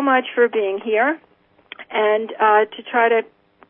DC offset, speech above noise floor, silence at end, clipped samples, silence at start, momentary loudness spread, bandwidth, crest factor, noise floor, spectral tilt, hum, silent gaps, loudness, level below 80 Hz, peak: under 0.1%; 26 dB; 0.45 s; under 0.1%; 0 s; 7 LU; 3.7 kHz; 16 dB; -44 dBFS; -8.5 dB/octave; none; none; -18 LUFS; -76 dBFS; -4 dBFS